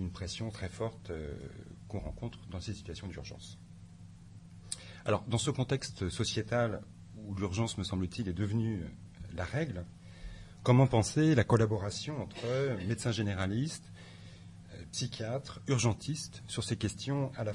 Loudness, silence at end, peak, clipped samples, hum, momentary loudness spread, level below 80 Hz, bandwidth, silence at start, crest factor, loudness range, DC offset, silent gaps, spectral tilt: -34 LUFS; 0 s; -14 dBFS; under 0.1%; none; 23 LU; -56 dBFS; 11.5 kHz; 0 s; 20 dB; 12 LU; under 0.1%; none; -5.5 dB/octave